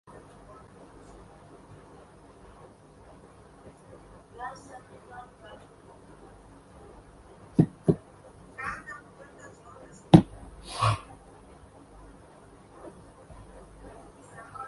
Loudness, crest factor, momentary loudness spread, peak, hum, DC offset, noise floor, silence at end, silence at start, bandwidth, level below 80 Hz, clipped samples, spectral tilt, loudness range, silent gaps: -27 LUFS; 32 dB; 26 LU; 0 dBFS; none; under 0.1%; -53 dBFS; 0 s; 4.4 s; 11.5 kHz; -52 dBFS; under 0.1%; -7.5 dB/octave; 24 LU; none